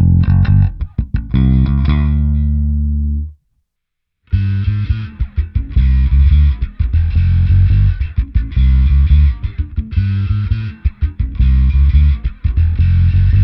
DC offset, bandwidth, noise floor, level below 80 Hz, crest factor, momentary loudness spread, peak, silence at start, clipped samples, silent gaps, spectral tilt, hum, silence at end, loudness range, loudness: under 0.1%; 4.9 kHz; -74 dBFS; -16 dBFS; 12 dB; 9 LU; 0 dBFS; 0 s; under 0.1%; none; -10.5 dB/octave; none; 0 s; 5 LU; -15 LUFS